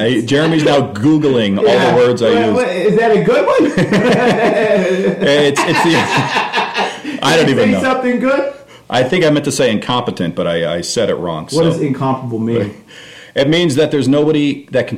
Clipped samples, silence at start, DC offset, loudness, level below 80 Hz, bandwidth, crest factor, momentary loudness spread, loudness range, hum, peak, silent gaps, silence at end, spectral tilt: under 0.1%; 0 s; under 0.1%; -13 LUFS; -48 dBFS; 15 kHz; 10 dB; 6 LU; 4 LU; none; -2 dBFS; none; 0 s; -5.5 dB/octave